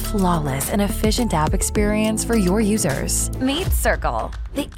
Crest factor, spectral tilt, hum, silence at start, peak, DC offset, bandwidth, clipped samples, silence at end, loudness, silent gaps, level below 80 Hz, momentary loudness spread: 14 dB; -4.5 dB/octave; none; 0 s; -6 dBFS; under 0.1%; 17.5 kHz; under 0.1%; 0 s; -20 LUFS; none; -26 dBFS; 4 LU